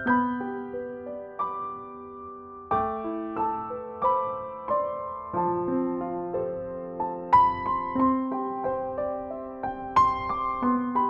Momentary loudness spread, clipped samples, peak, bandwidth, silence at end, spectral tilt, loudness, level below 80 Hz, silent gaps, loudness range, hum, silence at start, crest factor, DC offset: 13 LU; under 0.1%; -8 dBFS; 7 kHz; 0 s; -8 dB/octave; -28 LUFS; -54 dBFS; none; 6 LU; none; 0 s; 20 dB; under 0.1%